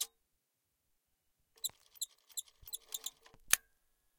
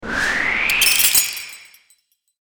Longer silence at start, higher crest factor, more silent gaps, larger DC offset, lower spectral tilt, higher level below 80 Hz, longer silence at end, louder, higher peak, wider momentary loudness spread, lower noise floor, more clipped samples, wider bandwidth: about the same, 0 s vs 0 s; first, 38 dB vs 20 dB; neither; neither; second, 2.5 dB/octave vs 1 dB/octave; second, -72 dBFS vs -44 dBFS; second, 0.6 s vs 0.8 s; second, -39 LUFS vs -15 LUFS; second, -6 dBFS vs 0 dBFS; about the same, 14 LU vs 15 LU; first, -84 dBFS vs -60 dBFS; neither; second, 16.5 kHz vs over 20 kHz